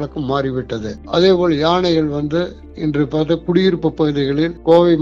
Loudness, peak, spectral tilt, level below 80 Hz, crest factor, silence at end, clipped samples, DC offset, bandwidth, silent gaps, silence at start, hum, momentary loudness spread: -17 LUFS; 0 dBFS; -7.5 dB/octave; -40 dBFS; 14 dB; 0 s; under 0.1%; under 0.1%; 7.4 kHz; none; 0 s; none; 9 LU